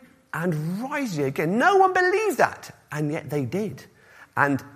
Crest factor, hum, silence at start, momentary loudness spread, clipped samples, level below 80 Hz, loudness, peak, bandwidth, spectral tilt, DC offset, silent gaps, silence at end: 22 dB; none; 0.35 s; 15 LU; under 0.1%; -66 dBFS; -23 LUFS; -2 dBFS; 15.5 kHz; -6 dB/octave; under 0.1%; none; 0.05 s